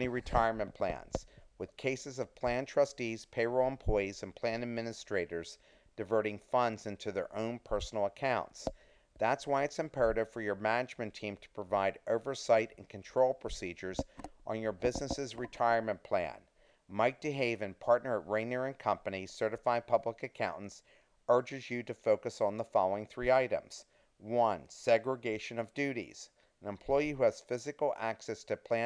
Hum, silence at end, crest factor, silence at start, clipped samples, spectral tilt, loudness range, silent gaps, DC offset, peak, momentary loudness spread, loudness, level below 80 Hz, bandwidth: none; 0 s; 22 dB; 0 s; under 0.1%; -5 dB/octave; 3 LU; none; under 0.1%; -14 dBFS; 12 LU; -35 LUFS; -54 dBFS; 10.5 kHz